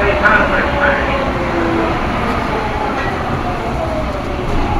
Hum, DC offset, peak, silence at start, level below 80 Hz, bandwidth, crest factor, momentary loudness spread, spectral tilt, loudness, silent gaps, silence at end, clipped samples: none; under 0.1%; 0 dBFS; 0 s; -24 dBFS; 14.5 kHz; 16 dB; 8 LU; -6.5 dB/octave; -16 LUFS; none; 0 s; under 0.1%